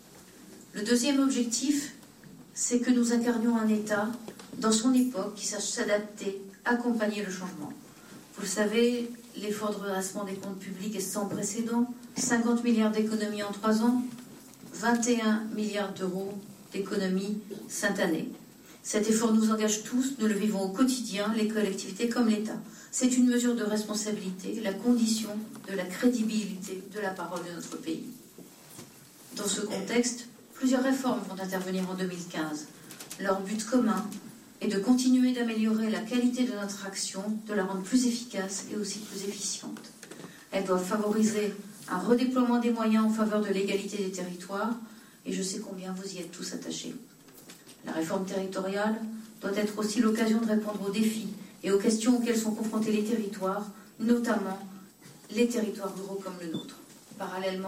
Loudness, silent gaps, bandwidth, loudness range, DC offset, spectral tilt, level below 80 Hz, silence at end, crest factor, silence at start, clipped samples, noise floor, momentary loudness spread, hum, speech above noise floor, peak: -30 LUFS; none; 16 kHz; 6 LU; under 0.1%; -4 dB/octave; -72 dBFS; 0 s; 18 dB; 0.05 s; under 0.1%; -52 dBFS; 16 LU; none; 23 dB; -12 dBFS